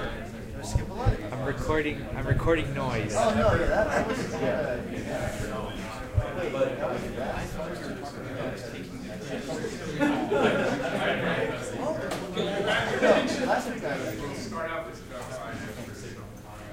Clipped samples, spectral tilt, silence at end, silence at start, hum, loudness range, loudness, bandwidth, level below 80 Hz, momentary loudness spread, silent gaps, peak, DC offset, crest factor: under 0.1%; -5.5 dB/octave; 0 s; 0 s; none; 6 LU; -29 LUFS; 16 kHz; -40 dBFS; 13 LU; none; -8 dBFS; under 0.1%; 20 dB